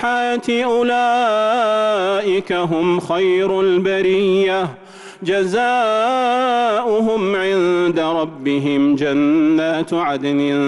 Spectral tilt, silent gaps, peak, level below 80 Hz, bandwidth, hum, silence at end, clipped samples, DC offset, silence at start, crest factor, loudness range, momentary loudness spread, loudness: -6 dB/octave; none; -8 dBFS; -56 dBFS; 11.5 kHz; none; 0 s; under 0.1%; under 0.1%; 0 s; 8 dB; 1 LU; 4 LU; -17 LUFS